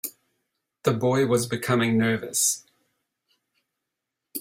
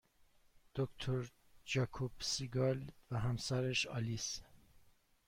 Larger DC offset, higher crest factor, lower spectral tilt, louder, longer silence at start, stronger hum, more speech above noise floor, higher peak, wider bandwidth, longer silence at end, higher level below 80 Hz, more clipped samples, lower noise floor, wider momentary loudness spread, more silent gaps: neither; about the same, 20 dB vs 16 dB; about the same, -4 dB/octave vs -4.5 dB/octave; first, -23 LUFS vs -40 LUFS; second, 0.05 s vs 0.55 s; neither; first, 61 dB vs 31 dB; first, -6 dBFS vs -24 dBFS; about the same, 16.5 kHz vs 16 kHz; second, 0 s vs 0.7 s; about the same, -64 dBFS vs -62 dBFS; neither; first, -84 dBFS vs -69 dBFS; about the same, 10 LU vs 8 LU; neither